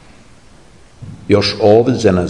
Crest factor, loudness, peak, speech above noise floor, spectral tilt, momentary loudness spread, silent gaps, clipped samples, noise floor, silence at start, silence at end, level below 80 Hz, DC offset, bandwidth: 14 dB; -12 LUFS; 0 dBFS; 33 dB; -6 dB/octave; 7 LU; none; under 0.1%; -44 dBFS; 1 s; 0 s; -48 dBFS; 0.5%; 10.5 kHz